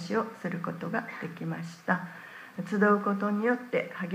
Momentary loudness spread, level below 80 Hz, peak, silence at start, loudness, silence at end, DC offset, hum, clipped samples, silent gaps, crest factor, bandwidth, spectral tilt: 14 LU; -82 dBFS; -12 dBFS; 0 s; -30 LUFS; 0 s; under 0.1%; none; under 0.1%; none; 20 dB; 15.5 kHz; -7 dB/octave